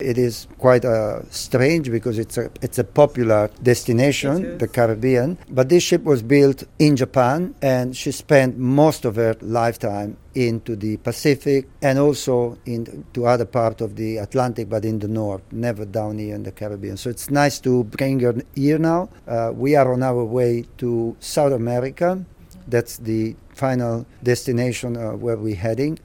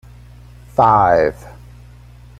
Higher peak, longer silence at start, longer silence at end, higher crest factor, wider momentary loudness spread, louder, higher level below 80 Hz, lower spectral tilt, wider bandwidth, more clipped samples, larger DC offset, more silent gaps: about the same, 0 dBFS vs -2 dBFS; second, 0 s vs 0.8 s; second, 0.05 s vs 0.9 s; about the same, 20 dB vs 16 dB; second, 10 LU vs 13 LU; second, -20 LUFS vs -14 LUFS; second, -48 dBFS vs -40 dBFS; second, -6 dB/octave vs -7.5 dB/octave; first, 17.5 kHz vs 13.5 kHz; neither; neither; neither